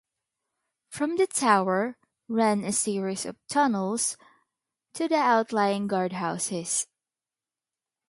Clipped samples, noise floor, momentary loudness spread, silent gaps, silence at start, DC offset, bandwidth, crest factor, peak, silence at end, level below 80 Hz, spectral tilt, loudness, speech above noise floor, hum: under 0.1%; under -90 dBFS; 11 LU; none; 0.9 s; under 0.1%; 11.5 kHz; 22 dB; -6 dBFS; 1.25 s; -74 dBFS; -4 dB/octave; -26 LUFS; over 64 dB; none